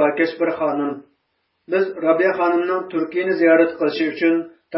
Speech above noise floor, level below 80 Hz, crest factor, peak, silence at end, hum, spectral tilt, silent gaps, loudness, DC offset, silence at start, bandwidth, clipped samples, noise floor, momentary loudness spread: 52 dB; -68 dBFS; 16 dB; -4 dBFS; 0 s; none; -10 dB/octave; none; -19 LUFS; under 0.1%; 0 s; 5.8 kHz; under 0.1%; -71 dBFS; 9 LU